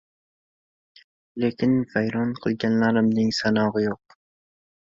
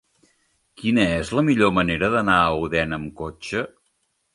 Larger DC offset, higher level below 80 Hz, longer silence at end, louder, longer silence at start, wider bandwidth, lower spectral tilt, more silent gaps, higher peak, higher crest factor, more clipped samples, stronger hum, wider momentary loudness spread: neither; second, -60 dBFS vs -44 dBFS; first, 0.95 s vs 0.65 s; about the same, -23 LUFS vs -21 LUFS; first, 1.35 s vs 0.8 s; second, 7.6 kHz vs 11.5 kHz; about the same, -6.5 dB/octave vs -6 dB/octave; neither; second, -10 dBFS vs -2 dBFS; about the same, 16 dB vs 20 dB; neither; neither; second, 7 LU vs 11 LU